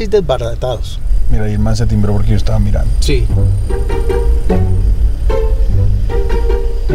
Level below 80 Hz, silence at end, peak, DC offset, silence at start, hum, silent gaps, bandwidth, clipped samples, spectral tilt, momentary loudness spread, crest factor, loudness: -14 dBFS; 0 s; 0 dBFS; under 0.1%; 0 s; none; none; 12 kHz; under 0.1%; -7 dB/octave; 4 LU; 10 dB; -15 LUFS